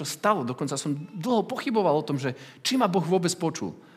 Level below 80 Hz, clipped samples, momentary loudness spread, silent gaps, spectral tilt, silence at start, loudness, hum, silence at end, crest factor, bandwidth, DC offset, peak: -80 dBFS; under 0.1%; 7 LU; none; -5 dB/octave; 0 s; -26 LUFS; none; 0.15 s; 18 dB; 16 kHz; under 0.1%; -8 dBFS